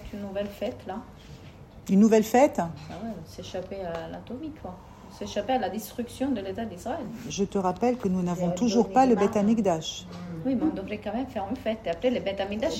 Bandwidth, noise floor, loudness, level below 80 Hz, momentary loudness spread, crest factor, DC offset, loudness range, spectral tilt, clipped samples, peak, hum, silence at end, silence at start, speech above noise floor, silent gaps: 16 kHz; -47 dBFS; -27 LUFS; -52 dBFS; 18 LU; 20 dB; under 0.1%; 8 LU; -6 dB/octave; under 0.1%; -8 dBFS; none; 0 s; 0 s; 20 dB; none